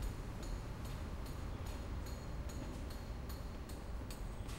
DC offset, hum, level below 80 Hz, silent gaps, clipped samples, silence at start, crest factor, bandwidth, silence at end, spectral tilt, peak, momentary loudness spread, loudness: under 0.1%; none; -46 dBFS; none; under 0.1%; 0 s; 12 dB; 16 kHz; 0 s; -5.5 dB/octave; -32 dBFS; 2 LU; -47 LUFS